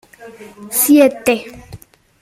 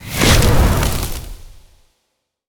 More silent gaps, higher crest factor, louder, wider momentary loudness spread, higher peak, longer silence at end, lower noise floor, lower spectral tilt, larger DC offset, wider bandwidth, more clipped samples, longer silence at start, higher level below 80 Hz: neither; about the same, 16 dB vs 16 dB; about the same, -13 LUFS vs -15 LUFS; second, 11 LU vs 18 LU; about the same, -2 dBFS vs 0 dBFS; second, 0.45 s vs 0.9 s; second, -39 dBFS vs -71 dBFS; about the same, -3 dB/octave vs -4 dB/octave; neither; second, 16 kHz vs over 20 kHz; neither; first, 0.2 s vs 0 s; second, -52 dBFS vs -22 dBFS